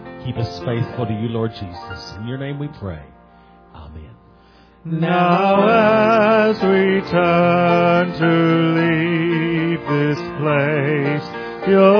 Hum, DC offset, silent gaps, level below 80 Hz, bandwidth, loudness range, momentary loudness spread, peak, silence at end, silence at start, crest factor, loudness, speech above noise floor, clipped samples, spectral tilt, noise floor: none; under 0.1%; none; -48 dBFS; 5.4 kHz; 14 LU; 15 LU; 0 dBFS; 0 s; 0 s; 16 dB; -17 LUFS; 32 dB; under 0.1%; -8.5 dB/octave; -48 dBFS